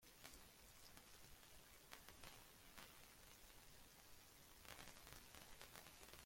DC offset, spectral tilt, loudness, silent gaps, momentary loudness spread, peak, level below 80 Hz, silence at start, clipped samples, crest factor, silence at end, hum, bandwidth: under 0.1%; -2 dB/octave; -63 LUFS; none; 5 LU; -34 dBFS; -74 dBFS; 0 s; under 0.1%; 30 dB; 0 s; none; 16.5 kHz